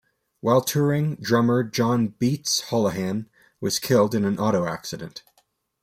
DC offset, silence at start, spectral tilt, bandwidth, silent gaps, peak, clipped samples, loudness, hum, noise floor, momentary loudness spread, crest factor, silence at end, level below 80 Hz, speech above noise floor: under 0.1%; 0.45 s; -5 dB/octave; 16 kHz; none; -6 dBFS; under 0.1%; -23 LUFS; none; -67 dBFS; 12 LU; 16 dB; 0.65 s; -62 dBFS; 44 dB